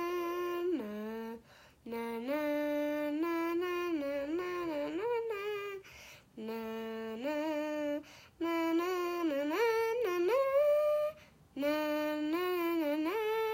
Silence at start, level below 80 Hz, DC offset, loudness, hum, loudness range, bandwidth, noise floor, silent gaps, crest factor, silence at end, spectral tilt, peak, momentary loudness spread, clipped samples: 0 s; -72 dBFS; under 0.1%; -35 LUFS; none; 6 LU; 16 kHz; -59 dBFS; none; 14 dB; 0 s; -4.5 dB/octave; -20 dBFS; 12 LU; under 0.1%